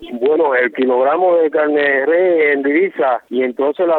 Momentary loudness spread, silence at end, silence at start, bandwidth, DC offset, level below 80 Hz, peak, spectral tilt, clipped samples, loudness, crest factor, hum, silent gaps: 4 LU; 0 s; 0 s; 4.3 kHz; under 0.1%; -64 dBFS; -4 dBFS; -7.5 dB/octave; under 0.1%; -14 LUFS; 10 dB; none; none